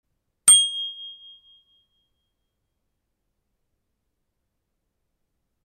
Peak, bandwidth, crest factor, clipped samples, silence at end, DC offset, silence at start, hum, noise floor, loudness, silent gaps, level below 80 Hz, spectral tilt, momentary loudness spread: -4 dBFS; 15 kHz; 24 dB; under 0.1%; 4.55 s; under 0.1%; 0.45 s; none; -77 dBFS; -16 LUFS; none; -70 dBFS; 4 dB/octave; 24 LU